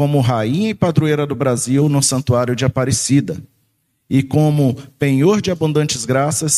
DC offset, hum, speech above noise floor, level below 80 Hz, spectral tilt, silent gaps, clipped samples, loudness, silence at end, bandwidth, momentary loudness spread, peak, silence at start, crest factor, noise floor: under 0.1%; none; 49 dB; -46 dBFS; -5.5 dB/octave; none; under 0.1%; -16 LUFS; 0 s; 14 kHz; 4 LU; 0 dBFS; 0 s; 14 dB; -65 dBFS